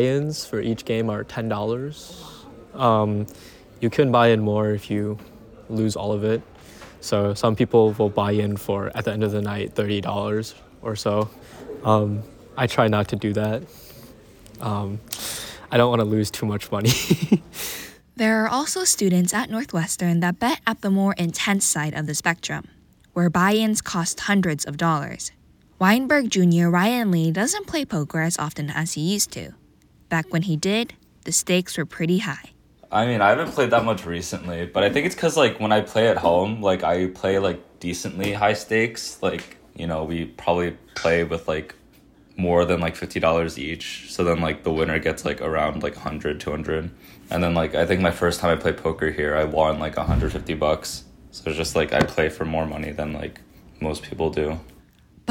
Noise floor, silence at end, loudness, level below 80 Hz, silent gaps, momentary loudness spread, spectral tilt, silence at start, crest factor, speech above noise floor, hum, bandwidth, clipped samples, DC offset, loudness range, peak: -55 dBFS; 0 s; -22 LUFS; -44 dBFS; none; 12 LU; -5 dB/octave; 0 s; 20 dB; 33 dB; none; 19 kHz; under 0.1%; under 0.1%; 4 LU; -2 dBFS